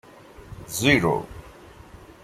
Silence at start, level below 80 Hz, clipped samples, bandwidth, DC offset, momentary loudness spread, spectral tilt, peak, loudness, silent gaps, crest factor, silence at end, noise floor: 0.4 s; -48 dBFS; under 0.1%; 16 kHz; under 0.1%; 25 LU; -4.5 dB/octave; -4 dBFS; -22 LUFS; none; 24 dB; 0.75 s; -46 dBFS